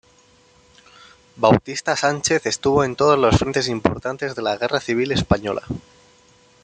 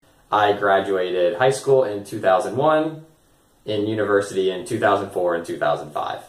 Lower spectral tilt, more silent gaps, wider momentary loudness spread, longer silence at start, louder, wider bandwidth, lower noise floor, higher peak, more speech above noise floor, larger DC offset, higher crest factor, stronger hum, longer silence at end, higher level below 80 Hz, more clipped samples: about the same, -4.5 dB/octave vs -5 dB/octave; neither; first, 10 LU vs 7 LU; first, 1.35 s vs 0.3 s; about the same, -20 LUFS vs -21 LUFS; second, 9.6 kHz vs 14.5 kHz; second, -54 dBFS vs -58 dBFS; about the same, -2 dBFS vs -4 dBFS; about the same, 35 dB vs 37 dB; neither; about the same, 20 dB vs 18 dB; neither; first, 0.85 s vs 0 s; first, -44 dBFS vs -62 dBFS; neither